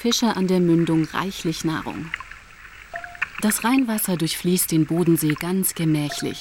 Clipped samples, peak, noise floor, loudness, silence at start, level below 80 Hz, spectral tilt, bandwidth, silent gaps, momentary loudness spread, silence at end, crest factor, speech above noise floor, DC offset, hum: under 0.1%; -8 dBFS; -43 dBFS; -22 LUFS; 0 s; -52 dBFS; -4.5 dB/octave; 17.5 kHz; none; 14 LU; 0 s; 14 dB; 22 dB; under 0.1%; none